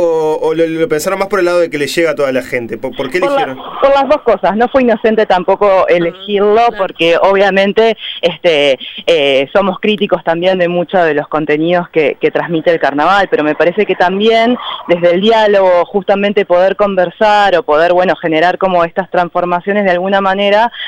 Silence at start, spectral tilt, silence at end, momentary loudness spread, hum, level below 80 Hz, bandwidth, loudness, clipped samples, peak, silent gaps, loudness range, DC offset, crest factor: 0 s; -5 dB/octave; 0 s; 5 LU; none; -44 dBFS; 16.5 kHz; -11 LUFS; under 0.1%; 0 dBFS; none; 2 LU; under 0.1%; 10 dB